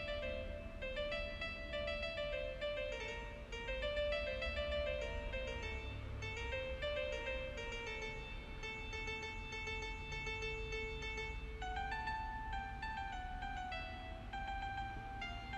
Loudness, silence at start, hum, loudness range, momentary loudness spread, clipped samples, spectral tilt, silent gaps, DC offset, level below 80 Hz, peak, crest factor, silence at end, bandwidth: -43 LUFS; 0 s; none; 3 LU; 6 LU; under 0.1%; -4.5 dB/octave; none; under 0.1%; -50 dBFS; -28 dBFS; 14 dB; 0 s; 11 kHz